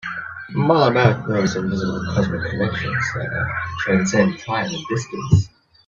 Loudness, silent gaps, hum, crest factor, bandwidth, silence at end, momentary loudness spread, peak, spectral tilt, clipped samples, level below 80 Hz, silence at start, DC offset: -20 LUFS; none; none; 20 dB; 7.6 kHz; 0.4 s; 9 LU; 0 dBFS; -6 dB/octave; under 0.1%; -46 dBFS; 0.05 s; under 0.1%